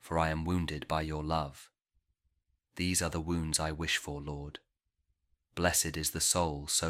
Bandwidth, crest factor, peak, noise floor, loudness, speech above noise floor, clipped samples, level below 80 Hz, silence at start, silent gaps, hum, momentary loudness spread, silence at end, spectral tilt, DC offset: 16.5 kHz; 24 dB; -12 dBFS; -81 dBFS; -32 LUFS; 48 dB; under 0.1%; -48 dBFS; 0.05 s; none; none; 14 LU; 0 s; -3 dB/octave; under 0.1%